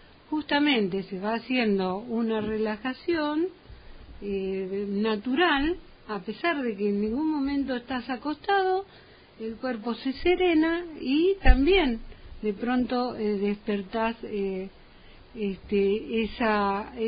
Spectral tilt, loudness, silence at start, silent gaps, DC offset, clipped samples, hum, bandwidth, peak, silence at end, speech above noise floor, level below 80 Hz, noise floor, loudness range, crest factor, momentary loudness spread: -10 dB/octave; -27 LUFS; 0.3 s; none; under 0.1%; under 0.1%; none; 5.2 kHz; -4 dBFS; 0 s; 24 dB; -38 dBFS; -50 dBFS; 5 LU; 24 dB; 11 LU